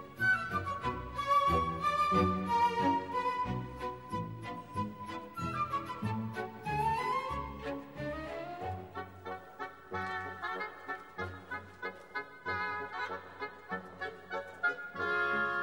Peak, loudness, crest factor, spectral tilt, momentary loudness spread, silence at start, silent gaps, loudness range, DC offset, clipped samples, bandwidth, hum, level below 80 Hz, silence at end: -18 dBFS; -35 LUFS; 18 dB; -6 dB/octave; 14 LU; 0 s; none; 10 LU; under 0.1%; under 0.1%; 16 kHz; none; -56 dBFS; 0 s